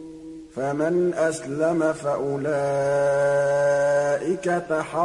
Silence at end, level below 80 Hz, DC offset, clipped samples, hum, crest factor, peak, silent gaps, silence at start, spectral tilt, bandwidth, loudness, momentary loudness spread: 0 s; -58 dBFS; under 0.1%; under 0.1%; none; 14 dB; -10 dBFS; none; 0 s; -6 dB/octave; 11.5 kHz; -23 LUFS; 6 LU